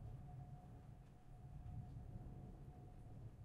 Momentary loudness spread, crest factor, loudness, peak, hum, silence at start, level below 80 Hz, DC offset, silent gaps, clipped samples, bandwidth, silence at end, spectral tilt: 7 LU; 12 dB; -58 LUFS; -42 dBFS; none; 0 s; -60 dBFS; under 0.1%; none; under 0.1%; 12 kHz; 0 s; -9 dB/octave